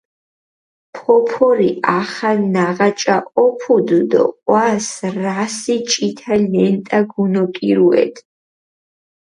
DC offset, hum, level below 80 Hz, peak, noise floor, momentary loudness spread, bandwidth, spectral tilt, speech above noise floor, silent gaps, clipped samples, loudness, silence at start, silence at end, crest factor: under 0.1%; none; -62 dBFS; 0 dBFS; under -90 dBFS; 6 LU; 11.5 kHz; -5 dB/octave; over 75 dB; none; under 0.1%; -16 LUFS; 0.95 s; 1 s; 16 dB